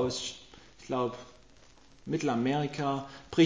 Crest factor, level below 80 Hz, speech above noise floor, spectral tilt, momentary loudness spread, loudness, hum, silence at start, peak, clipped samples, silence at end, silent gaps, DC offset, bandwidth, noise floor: 20 dB; -62 dBFS; 29 dB; -5.5 dB/octave; 20 LU; -33 LUFS; none; 0 s; -12 dBFS; under 0.1%; 0 s; none; under 0.1%; 7.8 kHz; -59 dBFS